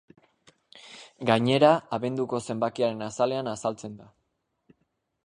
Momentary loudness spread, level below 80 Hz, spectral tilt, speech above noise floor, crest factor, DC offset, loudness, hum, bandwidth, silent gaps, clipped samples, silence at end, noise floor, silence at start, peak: 21 LU; -68 dBFS; -5.5 dB/octave; 50 dB; 22 dB; under 0.1%; -26 LUFS; none; 10.5 kHz; none; under 0.1%; 1.2 s; -76 dBFS; 0.75 s; -6 dBFS